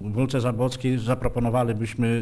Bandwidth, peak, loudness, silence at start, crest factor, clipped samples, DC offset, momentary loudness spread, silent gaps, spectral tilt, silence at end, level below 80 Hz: 11 kHz; -10 dBFS; -25 LUFS; 0 s; 14 dB; under 0.1%; under 0.1%; 2 LU; none; -7 dB/octave; 0 s; -40 dBFS